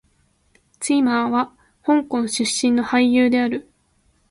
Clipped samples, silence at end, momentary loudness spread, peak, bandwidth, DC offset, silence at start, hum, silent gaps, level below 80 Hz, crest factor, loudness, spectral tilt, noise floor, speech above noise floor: under 0.1%; 0.7 s; 12 LU; -6 dBFS; 11.5 kHz; under 0.1%; 0.8 s; none; none; -58 dBFS; 16 dB; -19 LUFS; -3 dB/octave; -62 dBFS; 44 dB